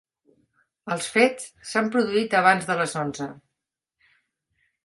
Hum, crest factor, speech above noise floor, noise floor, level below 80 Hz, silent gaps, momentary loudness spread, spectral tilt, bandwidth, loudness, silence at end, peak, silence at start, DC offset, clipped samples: none; 22 dB; 61 dB; -84 dBFS; -68 dBFS; none; 16 LU; -4 dB/octave; 11.5 kHz; -23 LUFS; 1.5 s; -4 dBFS; 0.85 s; under 0.1%; under 0.1%